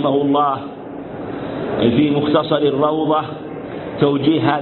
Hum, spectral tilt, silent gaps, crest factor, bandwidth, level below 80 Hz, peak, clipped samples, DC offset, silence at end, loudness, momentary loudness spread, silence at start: none; -12 dB/octave; none; 18 dB; 4.3 kHz; -50 dBFS; 0 dBFS; under 0.1%; under 0.1%; 0 s; -17 LUFS; 14 LU; 0 s